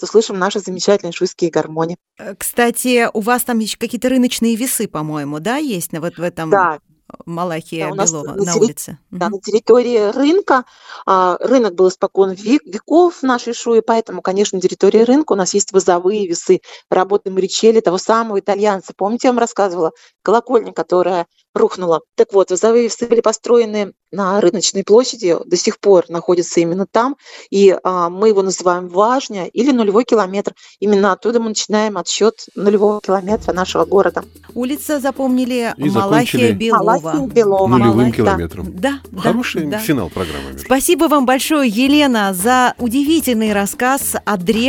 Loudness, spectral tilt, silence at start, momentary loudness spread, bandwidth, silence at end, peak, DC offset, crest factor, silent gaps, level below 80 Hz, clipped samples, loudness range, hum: -15 LUFS; -4.5 dB/octave; 0 s; 9 LU; 17.5 kHz; 0 s; 0 dBFS; under 0.1%; 14 dB; 21.49-21.54 s; -50 dBFS; under 0.1%; 3 LU; none